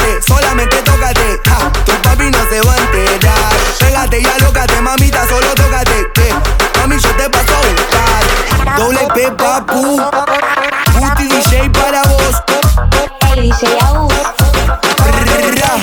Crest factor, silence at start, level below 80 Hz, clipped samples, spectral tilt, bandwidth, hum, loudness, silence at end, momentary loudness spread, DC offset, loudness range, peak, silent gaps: 10 dB; 0 s; -14 dBFS; under 0.1%; -4 dB/octave; 19.5 kHz; none; -10 LUFS; 0 s; 2 LU; under 0.1%; 1 LU; 0 dBFS; none